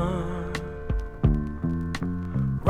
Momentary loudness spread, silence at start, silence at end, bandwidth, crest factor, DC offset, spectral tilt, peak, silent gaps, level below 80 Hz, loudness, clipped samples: 7 LU; 0 s; 0 s; 11.5 kHz; 20 dB; under 0.1%; -8 dB/octave; -8 dBFS; none; -32 dBFS; -29 LUFS; under 0.1%